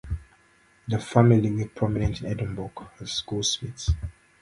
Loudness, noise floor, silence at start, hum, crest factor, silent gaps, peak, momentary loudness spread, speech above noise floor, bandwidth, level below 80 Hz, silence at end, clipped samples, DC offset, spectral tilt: -25 LUFS; -60 dBFS; 0.05 s; none; 22 dB; none; -4 dBFS; 18 LU; 35 dB; 11.5 kHz; -38 dBFS; 0.3 s; under 0.1%; under 0.1%; -5.5 dB/octave